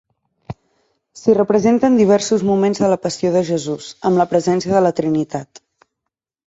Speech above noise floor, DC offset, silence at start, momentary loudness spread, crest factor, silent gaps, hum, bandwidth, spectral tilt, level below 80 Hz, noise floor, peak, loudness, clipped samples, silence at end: 65 dB; under 0.1%; 0.5 s; 13 LU; 14 dB; none; none; 8 kHz; -6 dB/octave; -54 dBFS; -80 dBFS; -2 dBFS; -16 LUFS; under 0.1%; 1.05 s